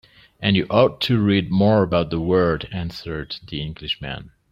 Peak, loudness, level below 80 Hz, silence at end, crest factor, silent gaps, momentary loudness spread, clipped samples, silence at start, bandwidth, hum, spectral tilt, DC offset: -2 dBFS; -21 LUFS; -44 dBFS; 0.25 s; 18 dB; none; 13 LU; under 0.1%; 0.4 s; 14.5 kHz; none; -8 dB/octave; under 0.1%